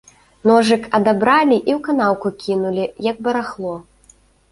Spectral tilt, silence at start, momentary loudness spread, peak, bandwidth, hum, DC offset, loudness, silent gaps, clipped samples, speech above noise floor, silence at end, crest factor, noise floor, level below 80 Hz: -5.5 dB/octave; 0.45 s; 10 LU; -2 dBFS; 11.5 kHz; none; under 0.1%; -17 LUFS; none; under 0.1%; 36 dB; 0.7 s; 16 dB; -52 dBFS; -56 dBFS